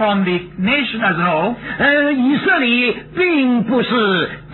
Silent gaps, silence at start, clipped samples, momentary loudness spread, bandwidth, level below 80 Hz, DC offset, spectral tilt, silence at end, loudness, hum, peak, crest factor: none; 0 s; under 0.1%; 5 LU; 4.3 kHz; -48 dBFS; under 0.1%; -9 dB/octave; 0 s; -15 LUFS; none; -4 dBFS; 12 dB